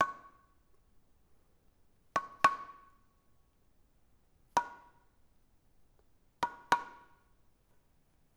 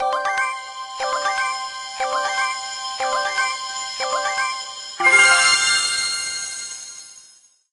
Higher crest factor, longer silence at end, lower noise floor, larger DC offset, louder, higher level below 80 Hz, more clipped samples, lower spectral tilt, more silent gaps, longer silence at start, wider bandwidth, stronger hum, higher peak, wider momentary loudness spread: first, 32 dB vs 20 dB; first, 1.45 s vs 0.5 s; first, -69 dBFS vs -52 dBFS; neither; second, -34 LUFS vs -19 LUFS; second, -72 dBFS vs -62 dBFS; neither; first, -2.5 dB/octave vs 2 dB/octave; neither; about the same, 0 s vs 0 s; first, over 20 kHz vs 11.5 kHz; neither; second, -10 dBFS vs 0 dBFS; first, 20 LU vs 17 LU